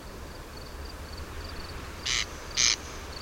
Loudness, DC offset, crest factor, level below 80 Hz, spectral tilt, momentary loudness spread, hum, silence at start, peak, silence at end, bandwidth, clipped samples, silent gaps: -29 LUFS; under 0.1%; 26 dB; -44 dBFS; -1 dB/octave; 19 LU; none; 0 s; -6 dBFS; 0 s; 16.5 kHz; under 0.1%; none